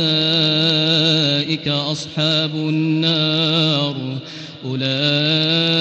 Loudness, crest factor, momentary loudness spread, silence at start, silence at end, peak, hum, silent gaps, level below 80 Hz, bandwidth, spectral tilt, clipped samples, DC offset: -16 LUFS; 14 dB; 11 LU; 0 s; 0 s; -4 dBFS; none; none; -60 dBFS; 8.8 kHz; -5.5 dB/octave; under 0.1%; under 0.1%